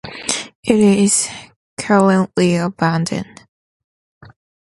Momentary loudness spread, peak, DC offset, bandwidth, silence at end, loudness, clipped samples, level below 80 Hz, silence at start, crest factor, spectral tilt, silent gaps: 16 LU; 0 dBFS; under 0.1%; 11.5 kHz; 1.45 s; -16 LUFS; under 0.1%; -54 dBFS; 0.05 s; 18 dB; -4.5 dB/octave; 0.55-0.63 s, 1.56-1.77 s